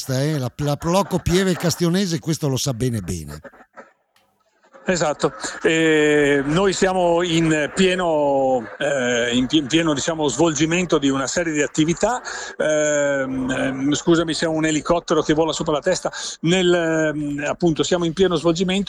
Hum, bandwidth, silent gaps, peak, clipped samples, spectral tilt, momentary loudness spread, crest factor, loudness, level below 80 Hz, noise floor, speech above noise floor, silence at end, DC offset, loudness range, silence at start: none; 15 kHz; none; -4 dBFS; under 0.1%; -4.5 dB/octave; 6 LU; 14 dB; -20 LUFS; -46 dBFS; -63 dBFS; 43 dB; 0.05 s; under 0.1%; 5 LU; 0 s